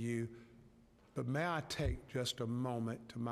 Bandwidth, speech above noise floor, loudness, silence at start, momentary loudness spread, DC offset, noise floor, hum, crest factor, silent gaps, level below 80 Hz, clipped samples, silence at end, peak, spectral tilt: 14.5 kHz; 26 dB; -40 LUFS; 0 s; 8 LU; under 0.1%; -65 dBFS; none; 16 dB; none; -54 dBFS; under 0.1%; 0 s; -24 dBFS; -5.5 dB/octave